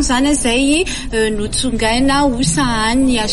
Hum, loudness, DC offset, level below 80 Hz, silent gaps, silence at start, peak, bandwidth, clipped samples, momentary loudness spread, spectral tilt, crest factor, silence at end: none; -15 LUFS; under 0.1%; -26 dBFS; none; 0 s; -4 dBFS; 11.5 kHz; under 0.1%; 4 LU; -3.5 dB/octave; 12 dB; 0 s